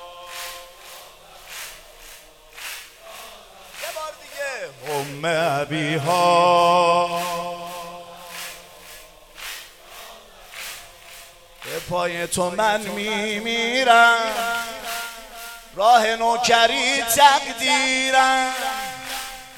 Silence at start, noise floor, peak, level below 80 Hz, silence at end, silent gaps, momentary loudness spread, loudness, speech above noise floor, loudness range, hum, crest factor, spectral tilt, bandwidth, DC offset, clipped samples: 0 s; -45 dBFS; 0 dBFS; -54 dBFS; 0 s; none; 24 LU; -19 LUFS; 27 dB; 19 LU; none; 22 dB; -2.5 dB/octave; 18.5 kHz; under 0.1%; under 0.1%